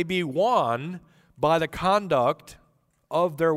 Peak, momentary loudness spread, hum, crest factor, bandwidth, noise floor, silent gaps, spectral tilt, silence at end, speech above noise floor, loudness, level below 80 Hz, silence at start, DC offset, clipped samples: -8 dBFS; 11 LU; none; 16 dB; 16 kHz; -65 dBFS; none; -6 dB/octave; 0 s; 41 dB; -24 LUFS; -54 dBFS; 0 s; under 0.1%; under 0.1%